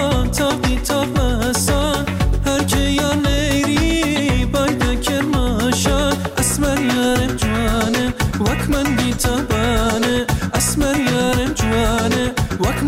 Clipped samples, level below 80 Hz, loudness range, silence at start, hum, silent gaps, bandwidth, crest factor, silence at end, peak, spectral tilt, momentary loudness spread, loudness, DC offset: under 0.1%; -24 dBFS; 1 LU; 0 s; none; none; 16.5 kHz; 10 dB; 0 s; -6 dBFS; -4.5 dB/octave; 3 LU; -17 LUFS; under 0.1%